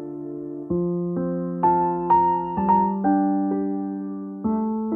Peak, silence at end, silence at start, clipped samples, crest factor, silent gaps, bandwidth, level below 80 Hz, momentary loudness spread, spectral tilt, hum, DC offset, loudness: -8 dBFS; 0 s; 0 s; under 0.1%; 14 dB; none; 3 kHz; -52 dBFS; 12 LU; -12 dB/octave; none; under 0.1%; -23 LUFS